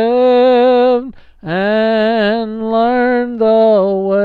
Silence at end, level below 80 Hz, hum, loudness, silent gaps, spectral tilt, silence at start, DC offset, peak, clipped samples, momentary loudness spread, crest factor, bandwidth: 0 s; -48 dBFS; none; -12 LUFS; none; -8 dB/octave; 0 s; under 0.1%; -2 dBFS; under 0.1%; 9 LU; 10 dB; 4.9 kHz